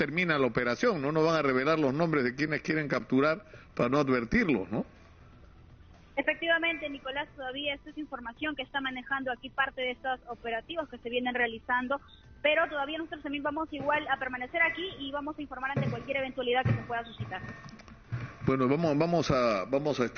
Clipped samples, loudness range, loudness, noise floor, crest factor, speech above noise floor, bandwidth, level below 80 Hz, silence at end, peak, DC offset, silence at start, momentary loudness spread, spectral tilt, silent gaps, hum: under 0.1%; 5 LU; -30 LUFS; -54 dBFS; 18 dB; 24 dB; 6.8 kHz; -56 dBFS; 0 s; -14 dBFS; under 0.1%; 0 s; 11 LU; -4 dB/octave; none; none